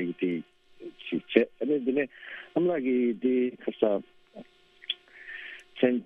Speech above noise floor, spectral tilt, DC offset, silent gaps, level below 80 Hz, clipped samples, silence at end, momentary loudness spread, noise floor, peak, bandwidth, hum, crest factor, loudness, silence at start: 24 dB; -7.5 dB/octave; under 0.1%; none; -74 dBFS; under 0.1%; 0 s; 16 LU; -52 dBFS; -4 dBFS; 4.5 kHz; none; 26 dB; -29 LUFS; 0 s